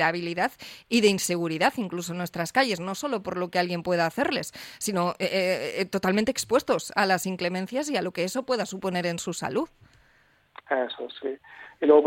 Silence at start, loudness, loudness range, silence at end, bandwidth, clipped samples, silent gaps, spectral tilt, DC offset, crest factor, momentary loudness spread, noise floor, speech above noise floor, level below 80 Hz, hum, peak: 0 s; -27 LUFS; 4 LU; 0 s; 16.5 kHz; under 0.1%; none; -4 dB/octave; under 0.1%; 20 dB; 8 LU; -62 dBFS; 36 dB; -64 dBFS; none; -6 dBFS